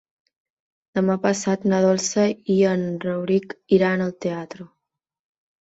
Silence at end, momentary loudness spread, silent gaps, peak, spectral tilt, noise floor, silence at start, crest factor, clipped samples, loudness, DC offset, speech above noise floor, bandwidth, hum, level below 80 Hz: 0.95 s; 10 LU; none; -4 dBFS; -5.5 dB/octave; -83 dBFS; 0.95 s; 18 dB; under 0.1%; -21 LUFS; under 0.1%; 62 dB; 8 kHz; none; -64 dBFS